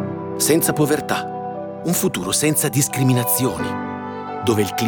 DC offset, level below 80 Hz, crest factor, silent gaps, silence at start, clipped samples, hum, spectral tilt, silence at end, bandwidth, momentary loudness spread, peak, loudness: under 0.1%; -54 dBFS; 16 dB; none; 0 s; under 0.1%; none; -4.5 dB/octave; 0 s; over 20 kHz; 11 LU; -4 dBFS; -20 LUFS